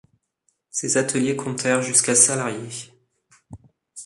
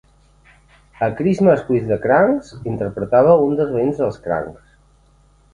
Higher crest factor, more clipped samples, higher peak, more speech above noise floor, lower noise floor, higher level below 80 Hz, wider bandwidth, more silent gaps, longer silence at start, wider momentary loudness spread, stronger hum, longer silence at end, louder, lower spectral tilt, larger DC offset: about the same, 22 dB vs 18 dB; neither; about the same, -2 dBFS vs 0 dBFS; first, 50 dB vs 37 dB; first, -71 dBFS vs -53 dBFS; second, -62 dBFS vs -48 dBFS; first, 12 kHz vs 9.8 kHz; neither; second, 0.75 s vs 1 s; first, 16 LU vs 11 LU; neither; second, 0 s vs 1 s; about the same, -19 LUFS vs -17 LUFS; second, -3 dB/octave vs -9 dB/octave; neither